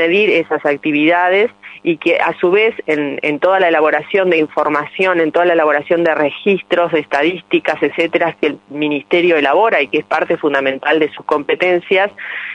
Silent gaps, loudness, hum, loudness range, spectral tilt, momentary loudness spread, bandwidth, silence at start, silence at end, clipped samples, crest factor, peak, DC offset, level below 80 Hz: none; -14 LUFS; none; 1 LU; -6 dB/octave; 6 LU; 8.8 kHz; 0 s; 0 s; under 0.1%; 12 dB; -2 dBFS; under 0.1%; -64 dBFS